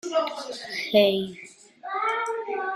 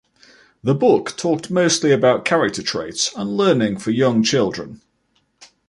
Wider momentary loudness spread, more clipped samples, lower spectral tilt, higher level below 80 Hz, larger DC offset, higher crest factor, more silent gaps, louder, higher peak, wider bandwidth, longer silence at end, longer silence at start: first, 20 LU vs 8 LU; neither; about the same, -4 dB/octave vs -4.5 dB/octave; second, -70 dBFS vs -56 dBFS; neither; about the same, 20 dB vs 16 dB; neither; second, -26 LUFS vs -18 LUFS; second, -6 dBFS vs -2 dBFS; first, 15.5 kHz vs 11.5 kHz; second, 0 s vs 0.95 s; second, 0.05 s vs 0.65 s